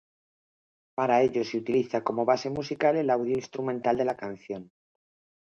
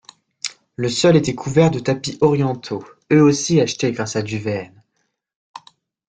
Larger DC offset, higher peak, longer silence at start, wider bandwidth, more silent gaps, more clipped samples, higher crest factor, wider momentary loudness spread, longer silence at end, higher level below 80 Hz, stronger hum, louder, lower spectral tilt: neither; second, -10 dBFS vs -2 dBFS; first, 1 s vs 0.45 s; second, 7.2 kHz vs 9.4 kHz; second, none vs 5.36-5.54 s; neither; about the same, 20 dB vs 18 dB; about the same, 13 LU vs 15 LU; first, 0.85 s vs 0.5 s; second, -66 dBFS vs -54 dBFS; neither; second, -27 LUFS vs -18 LUFS; about the same, -6 dB/octave vs -5.5 dB/octave